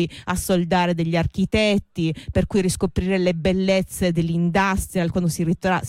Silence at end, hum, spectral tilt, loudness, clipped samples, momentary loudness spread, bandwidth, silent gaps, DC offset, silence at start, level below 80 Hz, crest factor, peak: 0 s; none; -5.5 dB/octave; -21 LUFS; under 0.1%; 4 LU; 16 kHz; none; under 0.1%; 0 s; -38 dBFS; 12 dB; -8 dBFS